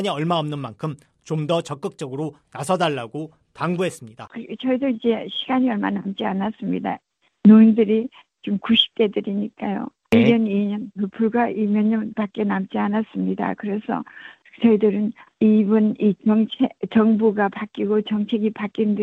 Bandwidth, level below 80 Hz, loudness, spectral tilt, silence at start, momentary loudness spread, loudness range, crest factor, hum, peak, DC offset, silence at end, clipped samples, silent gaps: 10.5 kHz; -62 dBFS; -21 LUFS; -7 dB/octave; 0 s; 13 LU; 7 LU; 18 dB; none; -2 dBFS; under 0.1%; 0 s; under 0.1%; none